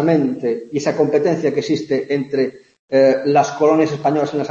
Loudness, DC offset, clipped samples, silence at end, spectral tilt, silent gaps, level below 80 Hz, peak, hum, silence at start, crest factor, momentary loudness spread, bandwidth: -17 LUFS; under 0.1%; under 0.1%; 0 s; -6.5 dB/octave; 2.79-2.88 s; -62 dBFS; -2 dBFS; none; 0 s; 14 dB; 7 LU; 7.6 kHz